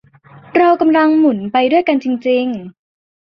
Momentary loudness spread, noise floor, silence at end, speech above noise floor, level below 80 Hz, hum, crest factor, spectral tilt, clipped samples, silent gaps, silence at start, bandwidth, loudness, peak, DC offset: 7 LU; -42 dBFS; 0.65 s; 29 dB; -60 dBFS; none; 14 dB; -7.5 dB/octave; under 0.1%; none; 0.55 s; 6 kHz; -14 LUFS; 0 dBFS; under 0.1%